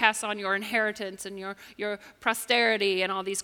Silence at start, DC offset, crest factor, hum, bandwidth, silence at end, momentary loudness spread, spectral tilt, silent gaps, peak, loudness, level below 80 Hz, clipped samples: 0 s; under 0.1%; 24 dB; none; 18 kHz; 0 s; 14 LU; -2 dB/octave; none; -4 dBFS; -27 LUFS; -70 dBFS; under 0.1%